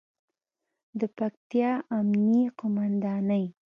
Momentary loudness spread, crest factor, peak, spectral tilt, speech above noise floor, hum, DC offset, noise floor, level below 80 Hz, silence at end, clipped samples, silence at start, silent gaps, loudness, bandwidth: 10 LU; 14 dB; -14 dBFS; -10 dB/octave; 59 dB; none; under 0.1%; -85 dBFS; -76 dBFS; 0.25 s; under 0.1%; 0.95 s; 1.37-1.50 s; -27 LUFS; 5 kHz